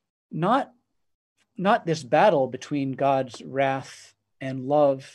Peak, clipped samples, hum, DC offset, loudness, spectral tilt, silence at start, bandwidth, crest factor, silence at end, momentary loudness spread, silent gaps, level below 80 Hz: -6 dBFS; under 0.1%; none; under 0.1%; -24 LUFS; -6 dB/octave; 0.3 s; 11.5 kHz; 20 dB; 0.05 s; 14 LU; 1.14-1.36 s; -74 dBFS